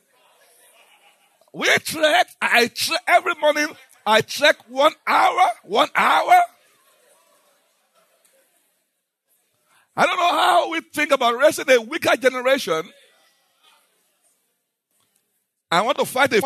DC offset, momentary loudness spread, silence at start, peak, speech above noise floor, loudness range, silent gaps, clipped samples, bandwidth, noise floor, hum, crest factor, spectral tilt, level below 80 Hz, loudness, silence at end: under 0.1%; 7 LU; 1.55 s; -2 dBFS; 56 dB; 9 LU; none; under 0.1%; 13.5 kHz; -74 dBFS; none; 18 dB; -2 dB/octave; -80 dBFS; -18 LUFS; 0 s